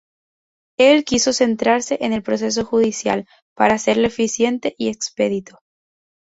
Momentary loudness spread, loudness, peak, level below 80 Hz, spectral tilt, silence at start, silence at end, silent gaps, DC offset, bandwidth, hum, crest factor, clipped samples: 9 LU; -18 LUFS; -2 dBFS; -54 dBFS; -3.5 dB/octave; 0.8 s; 0.8 s; 3.42-3.56 s; under 0.1%; 8 kHz; none; 18 dB; under 0.1%